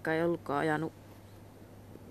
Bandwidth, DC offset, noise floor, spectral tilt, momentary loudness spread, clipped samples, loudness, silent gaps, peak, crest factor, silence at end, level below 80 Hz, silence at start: 14.5 kHz; under 0.1%; -52 dBFS; -7 dB/octave; 22 LU; under 0.1%; -33 LUFS; none; -18 dBFS; 16 dB; 0 s; -66 dBFS; 0 s